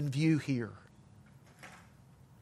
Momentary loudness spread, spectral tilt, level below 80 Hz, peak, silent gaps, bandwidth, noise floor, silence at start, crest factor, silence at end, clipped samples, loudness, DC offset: 25 LU; -7 dB/octave; -70 dBFS; -18 dBFS; none; 12.5 kHz; -59 dBFS; 0 s; 18 dB; 0.65 s; under 0.1%; -33 LUFS; under 0.1%